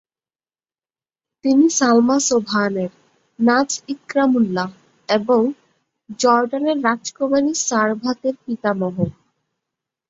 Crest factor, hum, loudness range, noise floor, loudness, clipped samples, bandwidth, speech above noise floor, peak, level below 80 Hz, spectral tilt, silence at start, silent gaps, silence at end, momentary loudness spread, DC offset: 18 dB; none; 2 LU; under -90 dBFS; -18 LUFS; under 0.1%; 8 kHz; over 72 dB; -2 dBFS; -60 dBFS; -4 dB/octave; 1.45 s; none; 1 s; 11 LU; under 0.1%